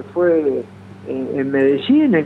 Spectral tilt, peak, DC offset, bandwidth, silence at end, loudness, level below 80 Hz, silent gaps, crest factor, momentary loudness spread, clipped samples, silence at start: -8.5 dB/octave; -4 dBFS; under 0.1%; 4.6 kHz; 0 s; -17 LUFS; -64 dBFS; none; 12 dB; 15 LU; under 0.1%; 0 s